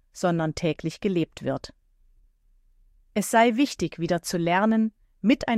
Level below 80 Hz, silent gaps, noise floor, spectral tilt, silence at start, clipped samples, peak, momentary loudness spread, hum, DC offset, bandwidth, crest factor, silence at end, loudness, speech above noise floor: -54 dBFS; none; -61 dBFS; -5.5 dB/octave; 0.15 s; under 0.1%; -8 dBFS; 11 LU; none; under 0.1%; 15.5 kHz; 18 dB; 0 s; -25 LUFS; 37 dB